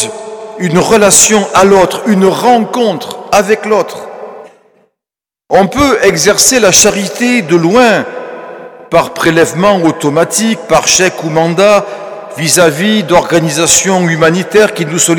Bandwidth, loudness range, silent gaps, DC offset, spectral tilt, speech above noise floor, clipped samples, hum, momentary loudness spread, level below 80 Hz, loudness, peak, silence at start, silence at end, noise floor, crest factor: over 20 kHz; 4 LU; none; under 0.1%; -3 dB/octave; 78 dB; 0.9%; none; 15 LU; -40 dBFS; -8 LUFS; 0 dBFS; 0 s; 0 s; -87 dBFS; 10 dB